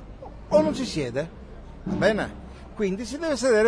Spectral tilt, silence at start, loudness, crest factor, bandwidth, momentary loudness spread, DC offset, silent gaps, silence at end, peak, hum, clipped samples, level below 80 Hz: -5 dB/octave; 0 s; -26 LUFS; 18 dB; 10.5 kHz; 21 LU; under 0.1%; none; 0 s; -8 dBFS; none; under 0.1%; -44 dBFS